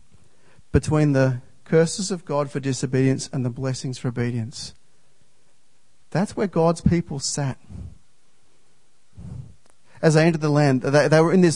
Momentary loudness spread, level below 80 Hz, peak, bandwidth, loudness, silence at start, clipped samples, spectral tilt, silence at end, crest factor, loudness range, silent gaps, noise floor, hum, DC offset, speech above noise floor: 20 LU; -46 dBFS; -2 dBFS; 11 kHz; -22 LUFS; 0.75 s; under 0.1%; -6 dB/octave; 0 s; 20 dB; 7 LU; none; -65 dBFS; none; 0.6%; 45 dB